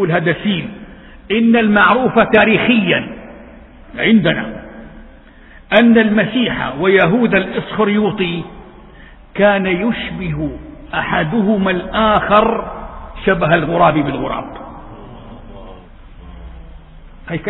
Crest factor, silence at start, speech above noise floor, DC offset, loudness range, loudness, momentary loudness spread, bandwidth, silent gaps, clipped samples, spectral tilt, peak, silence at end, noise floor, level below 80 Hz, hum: 16 dB; 0 s; 27 dB; under 0.1%; 5 LU; -14 LUFS; 22 LU; 4.1 kHz; none; under 0.1%; -9 dB/octave; 0 dBFS; 0 s; -40 dBFS; -38 dBFS; none